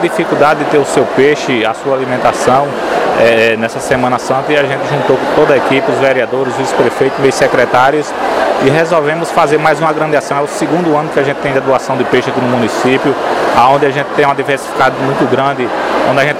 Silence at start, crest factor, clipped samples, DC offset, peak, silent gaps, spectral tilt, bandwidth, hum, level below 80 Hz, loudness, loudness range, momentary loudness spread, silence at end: 0 s; 10 dB; 0.2%; under 0.1%; 0 dBFS; none; -5 dB/octave; 15.5 kHz; none; -46 dBFS; -11 LUFS; 1 LU; 5 LU; 0 s